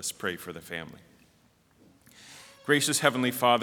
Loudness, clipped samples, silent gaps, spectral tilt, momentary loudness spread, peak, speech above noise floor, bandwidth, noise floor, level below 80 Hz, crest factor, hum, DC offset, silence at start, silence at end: -27 LUFS; under 0.1%; none; -3 dB/octave; 24 LU; -6 dBFS; 36 dB; over 20 kHz; -64 dBFS; -72 dBFS; 24 dB; none; under 0.1%; 0 s; 0 s